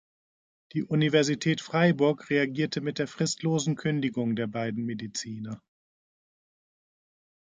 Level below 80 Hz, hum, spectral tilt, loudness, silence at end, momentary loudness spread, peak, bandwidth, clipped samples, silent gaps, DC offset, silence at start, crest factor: -70 dBFS; none; -5.5 dB/octave; -28 LUFS; 1.85 s; 11 LU; -10 dBFS; 9.4 kHz; under 0.1%; none; under 0.1%; 0.75 s; 20 dB